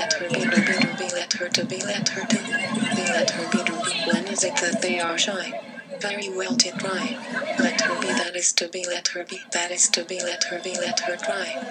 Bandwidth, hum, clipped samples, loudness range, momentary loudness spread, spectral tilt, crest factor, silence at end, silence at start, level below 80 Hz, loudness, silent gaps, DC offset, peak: 16.5 kHz; none; under 0.1%; 2 LU; 8 LU; -2 dB/octave; 22 dB; 0 s; 0 s; -80 dBFS; -23 LUFS; none; under 0.1%; -2 dBFS